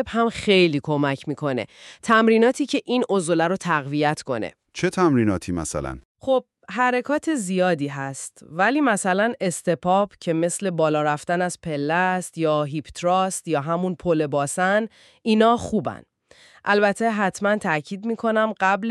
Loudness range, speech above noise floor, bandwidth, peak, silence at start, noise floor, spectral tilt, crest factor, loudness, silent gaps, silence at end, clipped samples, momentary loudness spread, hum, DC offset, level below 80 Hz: 2 LU; 31 dB; 13 kHz; -4 dBFS; 0 s; -53 dBFS; -5 dB/octave; 18 dB; -22 LUFS; 6.05-6.15 s; 0 s; under 0.1%; 10 LU; none; under 0.1%; -54 dBFS